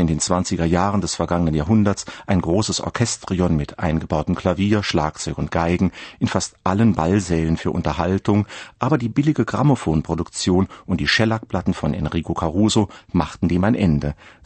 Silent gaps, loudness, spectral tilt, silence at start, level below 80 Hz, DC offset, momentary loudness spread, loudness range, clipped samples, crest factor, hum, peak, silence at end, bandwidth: none; -20 LUFS; -5.5 dB/octave; 0 s; -38 dBFS; under 0.1%; 6 LU; 1 LU; under 0.1%; 18 dB; none; -2 dBFS; 0.15 s; 8.8 kHz